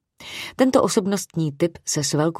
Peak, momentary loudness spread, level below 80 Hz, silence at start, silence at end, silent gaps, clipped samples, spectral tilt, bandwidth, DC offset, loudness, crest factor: -4 dBFS; 14 LU; -58 dBFS; 0.2 s; 0 s; none; under 0.1%; -4.5 dB/octave; 16 kHz; under 0.1%; -21 LUFS; 18 dB